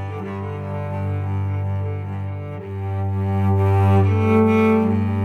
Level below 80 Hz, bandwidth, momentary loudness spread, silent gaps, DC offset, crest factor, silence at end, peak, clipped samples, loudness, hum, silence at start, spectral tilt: -62 dBFS; 4 kHz; 12 LU; none; under 0.1%; 16 dB; 0 s; -4 dBFS; under 0.1%; -21 LUFS; none; 0 s; -9.5 dB/octave